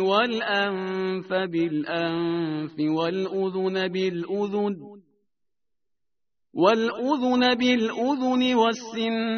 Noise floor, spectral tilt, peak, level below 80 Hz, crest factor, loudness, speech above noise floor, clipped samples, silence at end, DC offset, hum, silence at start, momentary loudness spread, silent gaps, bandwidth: -86 dBFS; -3.5 dB/octave; -4 dBFS; -68 dBFS; 20 dB; -24 LUFS; 62 dB; under 0.1%; 0 s; under 0.1%; none; 0 s; 7 LU; none; 6.6 kHz